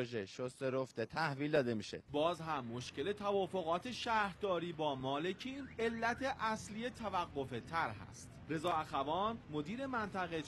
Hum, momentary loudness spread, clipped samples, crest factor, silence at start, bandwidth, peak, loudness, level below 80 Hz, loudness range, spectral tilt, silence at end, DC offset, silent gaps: none; 7 LU; under 0.1%; 18 dB; 0 s; 12.5 kHz; -20 dBFS; -39 LUFS; -66 dBFS; 2 LU; -5 dB/octave; 0 s; under 0.1%; none